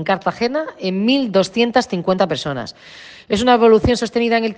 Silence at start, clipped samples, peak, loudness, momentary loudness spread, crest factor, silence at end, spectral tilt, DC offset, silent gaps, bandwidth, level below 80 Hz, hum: 0 s; under 0.1%; -2 dBFS; -17 LUFS; 11 LU; 16 dB; 0.05 s; -5.5 dB/octave; under 0.1%; none; 9.4 kHz; -42 dBFS; none